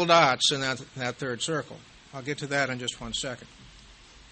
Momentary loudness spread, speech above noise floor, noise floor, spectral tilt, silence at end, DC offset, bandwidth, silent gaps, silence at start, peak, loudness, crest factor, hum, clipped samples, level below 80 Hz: 20 LU; 24 dB; -52 dBFS; -3 dB/octave; 0.4 s; under 0.1%; 8.8 kHz; none; 0 s; -4 dBFS; -27 LUFS; 24 dB; none; under 0.1%; -58 dBFS